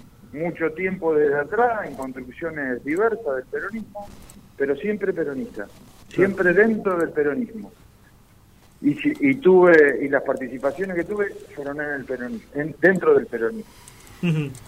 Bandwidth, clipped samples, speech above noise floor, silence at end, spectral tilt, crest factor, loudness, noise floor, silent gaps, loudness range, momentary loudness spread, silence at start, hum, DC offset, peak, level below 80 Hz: 15.5 kHz; under 0.1%; 30 dB; 0.1 s; -7.5 dB/octave; 20 dB; -22 LUFS; -52 dBFS; none; 7 LU; 16 LU; 0.3 s; none; under 0.1%; -2 dBFS; -54 dBFS